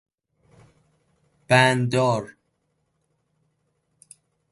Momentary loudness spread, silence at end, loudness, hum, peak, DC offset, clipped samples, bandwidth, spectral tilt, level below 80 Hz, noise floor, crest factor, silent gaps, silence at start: 11 LU; 2.25 s; -20 LUFS; none; -4 dBFS; under 0.1%; under 0.1%; 11.5 kHz; -5 dB/octave; -64 dBFS; -73 dBFS; 22 dB; none; 1.5 s